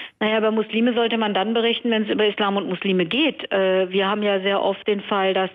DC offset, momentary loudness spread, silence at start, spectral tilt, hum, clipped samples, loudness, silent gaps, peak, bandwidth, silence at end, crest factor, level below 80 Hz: under 0.1%; 3 LU; 0 s; -8 dB/octave; none; under 0.1%; -21 LUFS; none; -10 dBFS; 5.2 kHz; 0 s; 10 dB; -68 dBFS